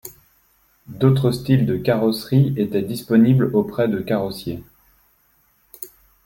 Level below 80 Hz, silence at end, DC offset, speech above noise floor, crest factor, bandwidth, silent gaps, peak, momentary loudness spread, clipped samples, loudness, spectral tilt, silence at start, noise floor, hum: -52 dBFS; 0.4 s; under 0.1%; 43 dB; 18 dB; 17 kHz; none; -2 dBFS; 20 LU; under 0.1%; -19 LUFS; -8 dB/octave; 0.05 s; -61 dBFS; none